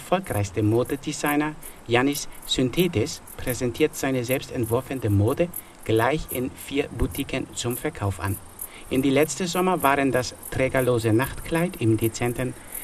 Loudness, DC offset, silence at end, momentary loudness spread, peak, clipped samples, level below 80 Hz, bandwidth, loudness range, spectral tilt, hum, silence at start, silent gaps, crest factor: -25 LUFS; under 0.1%; 0 s; 8 LU; -4 dBFS; under 0.1%; -42 dBFS; 15.5 kHz; 3 LU; -5 dB/octave; none; 0 s; none; 22 dB